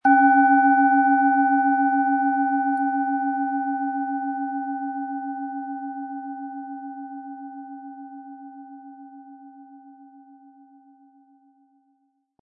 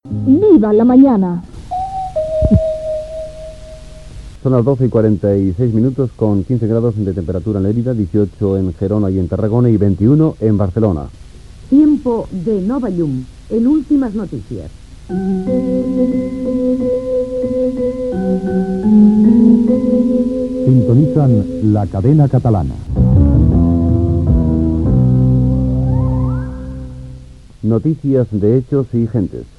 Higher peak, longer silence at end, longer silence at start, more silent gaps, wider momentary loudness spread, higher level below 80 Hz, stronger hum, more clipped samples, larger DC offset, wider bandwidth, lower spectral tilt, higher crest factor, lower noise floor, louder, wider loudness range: second, -6 dBFS vs 0 dBFS; first, 2.35 s vs 0.15 s; about the same, 0.05 s vs 0.05 s; neither; first, 24 LU vs 12 LU; second, under -90 dBFS vs -26 dBFS; neither; neither; second, under 0.1% vs 0.4%; second, 2.4 kHz vs 8.8 kHz; second, -7.5 dB/octave vs -11 dB/octave; about the same, 18 dB vs 14 dB; first, -69 dBFS vs -35 dBFS; second, -21 LUFS vs -14 LUFS; first, 23 LU vs 5 LU